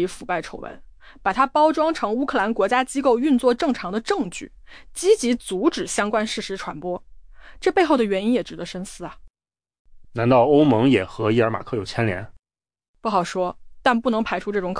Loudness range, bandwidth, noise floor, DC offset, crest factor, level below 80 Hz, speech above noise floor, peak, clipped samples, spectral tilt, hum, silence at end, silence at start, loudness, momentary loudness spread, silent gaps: 4 LU; 10.5 kHz; under -90 dBFS; under 0.1%; 16 dB; -50 dBFS; over 69 dB; -6 dBFS; under 0.1%; -5.5 dB/octave; none; 0 s; 0 s; -21 LUFS; 14 LU; 9.30-9.34 s, 9.79-9.85 s, 12.88-12.94 s